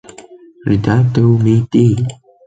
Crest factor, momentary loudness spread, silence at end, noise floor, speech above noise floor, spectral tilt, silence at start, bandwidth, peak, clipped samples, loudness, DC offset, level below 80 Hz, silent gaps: 12 dB; 9 LU; 0.35 s; -39 dBFS; 27 dB; -8.5 dB/octave; 0.2 s; 8 kHz; -2 dBFS; under 0.1%; -13 LUFS; under 0.1%; -40 dBFS; none